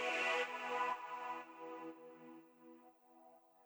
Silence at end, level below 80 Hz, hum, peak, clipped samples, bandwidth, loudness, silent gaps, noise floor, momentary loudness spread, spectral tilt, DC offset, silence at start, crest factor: 0.25 s; under -90 dBFS; none; -26 dBFS; under 0.1%; over 20 kHz; -42 LUFS; none; -66 dBFS; 25 LU; -1.5 dB/octave; under 0.1%; 0 s; 18 dB